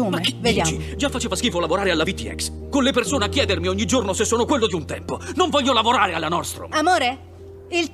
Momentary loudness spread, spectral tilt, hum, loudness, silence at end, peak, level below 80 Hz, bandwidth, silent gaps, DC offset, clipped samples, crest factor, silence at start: 8 LU; -3.5 dB/octave; none; -21 LUFS; 0 s; -4 dBFS; -40 dBFS; 15.5 kHz; none; under 0.1%; under 0.1%; 18 dB; 0 s